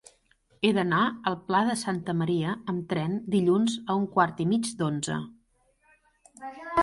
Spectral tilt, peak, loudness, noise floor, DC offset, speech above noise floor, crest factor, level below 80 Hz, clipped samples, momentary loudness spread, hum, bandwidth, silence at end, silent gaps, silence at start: -5.5 dB/octave; -8 dBFS; -27 LUFS; -67 dBFS; under 0.1%; 41 dB; 20 dB; -62 dBFS; under 0.1%; 8 LU; none; 11.5 kHz; 0 s; none; 0.6 s